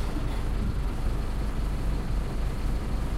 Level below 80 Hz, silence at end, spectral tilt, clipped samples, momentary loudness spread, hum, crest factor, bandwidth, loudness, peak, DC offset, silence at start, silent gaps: -28 dBFS; 0 s; -6.5 dB/octave; under 0.1%; 1 LU; none; 10 dB; 13 kHz; -32 LUFS; -16 dBFS; under 0.1%; 0 s; none